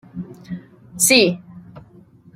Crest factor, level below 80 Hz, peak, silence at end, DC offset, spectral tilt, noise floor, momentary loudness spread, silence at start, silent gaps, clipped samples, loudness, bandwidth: 22 dB; -58 dBFS; 0 dBFS; 0.55 s; under 0.1%; -2.5 dB/octave; -48 dBFS; 22 LU; 0.15 s; none; under 0.1%; -14 LUFS; 16 kHz